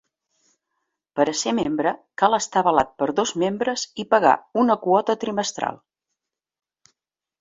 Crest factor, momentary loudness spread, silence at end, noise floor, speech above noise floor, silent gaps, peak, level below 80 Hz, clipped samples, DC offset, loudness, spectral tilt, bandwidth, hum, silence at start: 22 dB; 7 LU; 1.65 s; -83 dBFS; 62 dB; none; -2 dBFS; -62 dBFS; under 0.1%; under 0.1%; -21 LUFS; -3.5 dB/octave; 7.8 kHz; none; 1.15 s